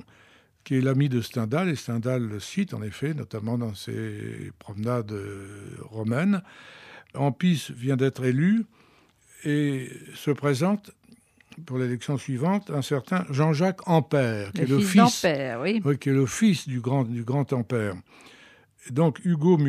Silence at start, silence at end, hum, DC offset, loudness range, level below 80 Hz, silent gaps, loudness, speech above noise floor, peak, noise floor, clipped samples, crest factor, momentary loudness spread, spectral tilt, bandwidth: 0.65 s; 0 s; none; under 0.1%; 8 LU; -66 dBFS; none; -26 LUFS; 34 dB; -4 dBFS; -59 dBFS; under 0.1%; 20 dB; 14 LU; -6.5 dB/octave; 15 kHz